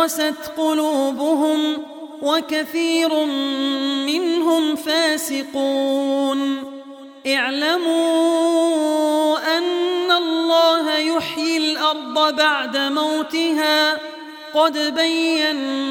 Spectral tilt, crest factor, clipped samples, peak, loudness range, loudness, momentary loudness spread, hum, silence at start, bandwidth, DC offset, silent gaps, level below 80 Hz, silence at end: -1.5 dB/octave; 16 dB; under 0.1%; -4 dBFS; 2 LU; -19 LUFS; 6 LU; none; 0 s; 18 kHz; under 0.1%; none; -70 dBFS; 0 s